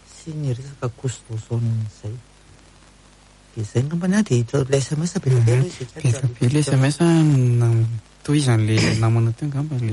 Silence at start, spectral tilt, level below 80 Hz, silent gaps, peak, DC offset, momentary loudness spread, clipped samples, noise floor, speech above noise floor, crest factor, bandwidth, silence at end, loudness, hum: 0.15 s; -6.5 dB/octave; -50 dBFS; none; -4 dBFS; under 0.1%; 14 LU; under 0.1%; -50 dBFS; 30 dB; 16 dB; 11.5 kHz; 0 s; -20 LUFS; none